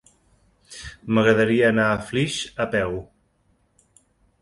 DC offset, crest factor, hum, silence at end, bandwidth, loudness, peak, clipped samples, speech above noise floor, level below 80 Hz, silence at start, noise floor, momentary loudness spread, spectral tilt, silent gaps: under 0.1%; 22 dB; none; 1.4 s; 11.5 kHz; -21 LUFS; -2 dBFS; under 0.1%; 44 dB; -52 dBFS; 0.7 s; -65 dBFS; 20 LU; -5.5 dB/octave; none